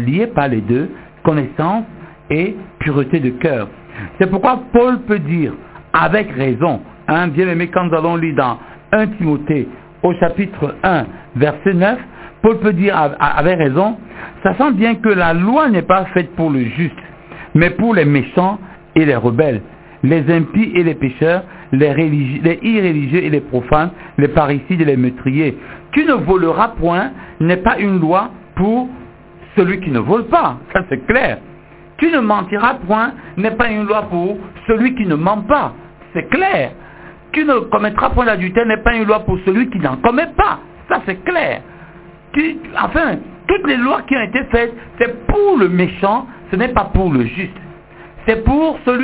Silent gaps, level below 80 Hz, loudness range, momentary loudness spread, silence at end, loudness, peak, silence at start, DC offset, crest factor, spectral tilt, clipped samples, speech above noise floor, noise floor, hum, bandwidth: none; -34 dBFS; 3 LU; 8 LU; 0 s; -15 LUFS; 0 dBFS; 0 s; under 0.1%; 14 dB; -11 dB/octave; under 0.1%; 24 dB; -39 dBFS; none; 4 kHz